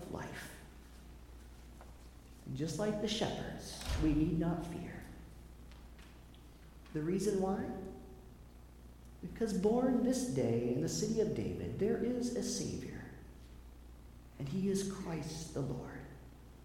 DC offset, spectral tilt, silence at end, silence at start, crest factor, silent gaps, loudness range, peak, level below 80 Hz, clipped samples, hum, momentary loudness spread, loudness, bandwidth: under 0.1%; -5.5 dB/octave; 0 s; 0 s; 18 dB; none; 7 LU; -20 dBFS; -52 dBFS; under 0.1%; none; 23 LU; -37 LUFS; 17 kHz